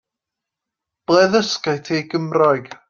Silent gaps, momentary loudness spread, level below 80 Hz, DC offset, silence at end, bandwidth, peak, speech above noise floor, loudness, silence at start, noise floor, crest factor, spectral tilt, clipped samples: none; 8 LU; -62 dBFS; under 0.1%; 0.15 s; 7.4 kHz; -2 dBFS; 67 dB; -18 LUFS; 1.1 s; -84 dBFS; 18 dB; -5 dB/octave; under 0.1%